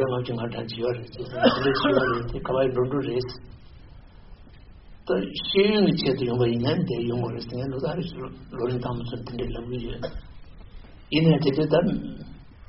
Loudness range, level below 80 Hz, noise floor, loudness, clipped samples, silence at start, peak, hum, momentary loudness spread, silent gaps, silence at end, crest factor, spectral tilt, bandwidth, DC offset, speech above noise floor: 7 LU; -44 dBFS; -47 dBFS; -25 LUFS; under 0.1%; 0 s; -4 dBFS; none; 15 LU; none; 0.05 s; 20 dB; -5 dB/octave; 5.8 kHz; under 0.1%; 22 dB